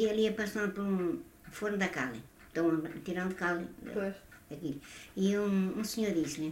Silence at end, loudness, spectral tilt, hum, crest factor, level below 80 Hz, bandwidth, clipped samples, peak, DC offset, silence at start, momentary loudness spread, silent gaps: 0 s; -34 LUFS; -5.5 dB/octave; none; 16 dB; -62 dBFS; 16 kHz; under 0.1%; -18 dBFS; under 0.1%; 0 s; 11 LU; none